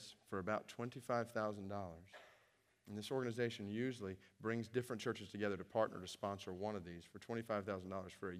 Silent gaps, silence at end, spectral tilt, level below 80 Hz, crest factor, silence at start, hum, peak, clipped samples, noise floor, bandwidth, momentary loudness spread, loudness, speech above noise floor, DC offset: none; 0 s; -6 dB/octave; -82 dBFS; 20 dB; 0 s; none; -24 dBFS; under 0.1%; -76 dBFS; 15.5 kHz; 10 LU; -44 LUFS; 31 dB; under 0.1%